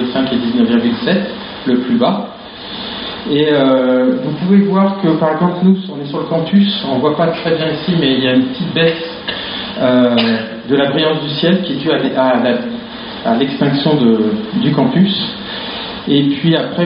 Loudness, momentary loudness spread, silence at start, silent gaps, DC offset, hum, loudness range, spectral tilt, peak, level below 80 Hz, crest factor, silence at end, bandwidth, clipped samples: -14 LUFS; 10 LU; 0 s; none; under 0.1%; none; 2 LU; -4.5 dB/octave; 0 dBFS; -50 dBFS; 14 dB; 0 s; 5.4 kHz; under 0.1%